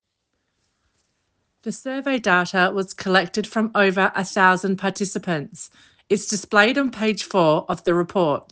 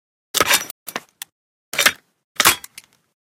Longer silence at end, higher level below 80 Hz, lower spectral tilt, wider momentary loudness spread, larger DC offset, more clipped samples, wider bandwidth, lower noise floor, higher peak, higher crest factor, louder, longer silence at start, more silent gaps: second, 0.1 s vs 0.75 s; second, -64 dBFS vs -56 dBFS; first, -4.5 dB/octave vs 0.5 dB/octave; second, 11 LU vs 22 LU; neither; neither; second, 10 kHz vs 17.5 kHz; first, -75 dBFS vs -44 dBFS; about the same, -2 dBFS vs 0 dBFS; about the same, 20 dB vs 22 dB; second, -20 LUFS vs -17 LUFS; first, 1.65 s vs 0.35 s; second, none vs 0.71-0.86 s, 1.32-1.72 s, 2.24-2.35 s